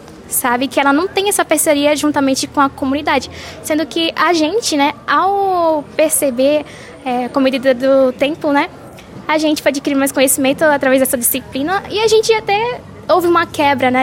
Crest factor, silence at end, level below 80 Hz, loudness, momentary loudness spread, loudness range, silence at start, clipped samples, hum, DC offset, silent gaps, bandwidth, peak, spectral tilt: 14 dB; 0 s; -48 dBFS; -14 LUFS; 7 LU; 2 LU; 0 s; under 0.1%; none; under 0.1%; none; 16.5 kHz; -2 dBFS; -2.5 dB/octave